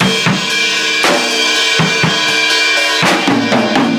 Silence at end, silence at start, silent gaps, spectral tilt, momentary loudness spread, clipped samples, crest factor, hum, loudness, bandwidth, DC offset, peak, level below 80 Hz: 0 s; 0 s; none; -3 dB/octave; 2 LU; under 0.1%; 12 dB; none; -11 LUFS; 16.5 kHz; under 0.1%; 0 dBFS; -52 dBFS